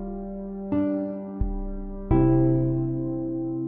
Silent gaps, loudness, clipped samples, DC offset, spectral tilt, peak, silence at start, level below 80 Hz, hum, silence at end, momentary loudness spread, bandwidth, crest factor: none; -26 LUFS; under 0.1%; under 0.1%; -13.5 dB/octave; -10 dBFS; 0 s; -34 dBFS; none; 0 s; 14 LU; 3.1 kHz; 16 dB